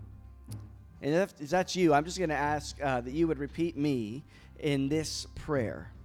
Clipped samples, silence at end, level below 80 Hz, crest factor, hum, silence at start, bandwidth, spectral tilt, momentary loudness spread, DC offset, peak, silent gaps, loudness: under 0.1%; 0 s; -50 dBFS; 18 dB; none; 0 s; 16 kHz; -5.5 dB/octave; 19 LU; under 0.1%; -14 dBFS; none; -31 LUFS